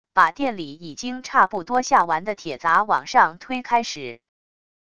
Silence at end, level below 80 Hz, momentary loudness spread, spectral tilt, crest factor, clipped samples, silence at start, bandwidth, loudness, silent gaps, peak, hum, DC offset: 0.8 s; -60 dBFS; 14 LU; -3 dB/octave; 20 dB; under 0.1%; 0.15 s; 11 kHz; -21 LUFS; none; -2 dBFS; none; 0.4%